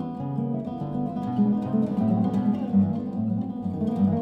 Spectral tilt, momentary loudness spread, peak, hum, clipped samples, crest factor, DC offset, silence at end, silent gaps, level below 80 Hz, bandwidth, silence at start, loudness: -11 dB/octave; 6 LU; -12 dBFS; none; under 0.1%; 14 dB; under 0.1%; 0 s; none; -58 dBFS; 4.5 kHz; 0 s; -26 LUFS